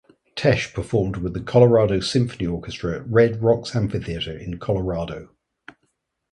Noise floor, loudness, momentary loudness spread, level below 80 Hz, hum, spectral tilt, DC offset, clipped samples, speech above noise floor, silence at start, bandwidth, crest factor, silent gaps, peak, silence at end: -72 dBFS; -21 LUFS; 12 LU; -42 dBFS; none; -6.5 dB/octave; under 0.1%; under 0.1%; 51 dB; 0.35 s; 11.5 kHz; 20 dB; none; -2 dBFS; 1.05 s